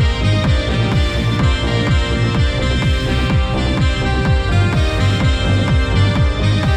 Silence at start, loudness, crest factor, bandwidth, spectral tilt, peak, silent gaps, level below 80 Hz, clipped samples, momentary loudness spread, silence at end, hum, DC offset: 0 s; -16 LUFS; 12 dB; 11 kHz; -6 dB/octave; -2 dBFS; none; -20 dBFS; under 0.1%; 2 LU; 0 s; none; under 0.1%